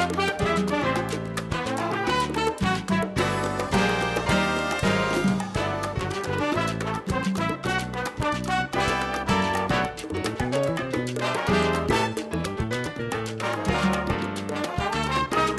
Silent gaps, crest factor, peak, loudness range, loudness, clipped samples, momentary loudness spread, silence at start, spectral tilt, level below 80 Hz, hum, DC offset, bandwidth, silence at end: none; 16 dB; -10 dBFS; 3 LU; -25 LUFS; under 0.1%; 6 LU; 0 s; -5 dB/octave; -42 dBFS; none; under 0.1%; 13 kHz; 0 s